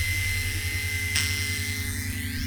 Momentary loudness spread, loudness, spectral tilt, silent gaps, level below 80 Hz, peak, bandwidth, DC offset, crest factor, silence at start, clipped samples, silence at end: 5 LU; -27 LUFS; -2.5 dB/octave; none; -38 dBFS; -6 dBFS; over 20 kHz; under 0.1%; 22 dB; 0 s; under 0.1%; 0 s